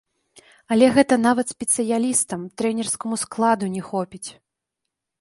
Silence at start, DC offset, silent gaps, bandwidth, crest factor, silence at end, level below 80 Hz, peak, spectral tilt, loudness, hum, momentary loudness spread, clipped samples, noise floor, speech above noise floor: 0.7 s; under 0.1%; none; 11.5 kHz; 20 dB; 0.9 s; -62 dBFS; -2 dBFS; -4 dB/octave; -21 LUFS; none; 11 LU; under 0.1%; -82 dBFS; 61 dB